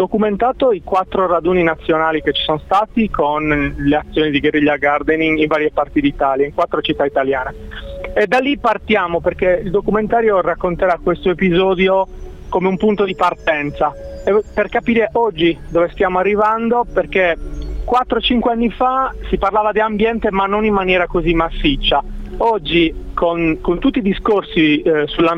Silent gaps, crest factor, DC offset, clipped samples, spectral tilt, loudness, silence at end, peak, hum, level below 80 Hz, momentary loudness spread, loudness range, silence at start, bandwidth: none; 14 dB; under 0.1%; under 0.1%; -7 dB/octave; -16 LUFS; 0 s; -2 dBFS; none; -32 dBFS; 4 LU; 1 LU; 0 s; 8.4 kHz